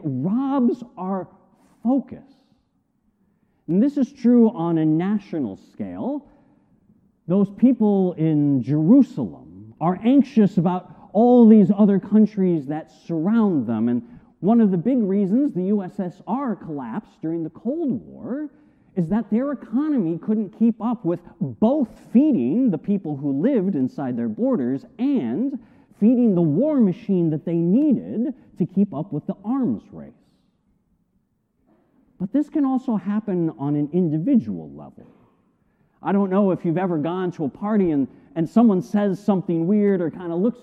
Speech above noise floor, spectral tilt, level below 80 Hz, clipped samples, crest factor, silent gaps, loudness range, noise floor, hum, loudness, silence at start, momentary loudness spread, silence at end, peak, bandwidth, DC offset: 48 dB; -10.5 dB/octave; -62 dBFS; under 0.1%; 18 dB; none; 9 LU; -68 dBFS; none; -21 LUFS; 0 s; 13 LU; 0.1 s; -4 dBFS; 6 kHz; under 0.1%